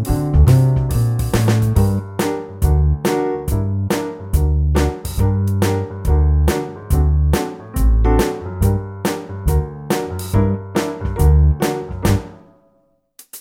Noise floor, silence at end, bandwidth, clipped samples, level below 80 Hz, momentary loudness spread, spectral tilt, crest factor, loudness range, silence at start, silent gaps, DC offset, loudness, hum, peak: -60 dBFS; 0 s; 16.5 kHz; under 0.1%; -20 dBFS; 8 LU; -7 dB/octave; 14 dB; 2 LU; 0 s; none; under 0.1%; -18 LUFS; none; -2 dBFS